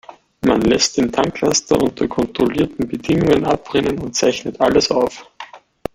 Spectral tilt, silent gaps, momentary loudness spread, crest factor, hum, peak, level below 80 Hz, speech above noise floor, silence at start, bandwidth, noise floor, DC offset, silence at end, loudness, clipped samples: -4 dB/octave; none; 8 LU; 16 dB; none; 0 dBFS; -42 dBFS; 22 dB; 0.45 s; 16 kHz; -38 dBFS; under 0.1%; 0.35 s; -17 LUFS; under 0.1%